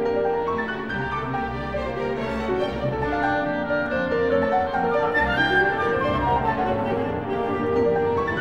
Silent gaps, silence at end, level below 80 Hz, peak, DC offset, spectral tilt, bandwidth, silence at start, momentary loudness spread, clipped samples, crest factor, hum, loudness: none; 0 s; -42 dBFS; -8 dBFS; 0.4%; -7 dB/octave; 8.4 kHz; 0 s; 7 LU; under 0.1%; 14 dB; none; -23 LUFS